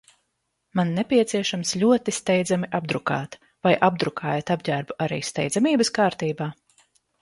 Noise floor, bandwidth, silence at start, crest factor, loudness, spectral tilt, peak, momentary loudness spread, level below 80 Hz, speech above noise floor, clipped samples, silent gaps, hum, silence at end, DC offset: -76 dBFS; 11.5 kHz; 0.75 s; 20 dB; -23 LUFS; -5 dB/octave; -4 dBFS; 8 LU; -62 dBFS; 53 dB; under 0.1%; none; none; 0.7 s; under 0.1%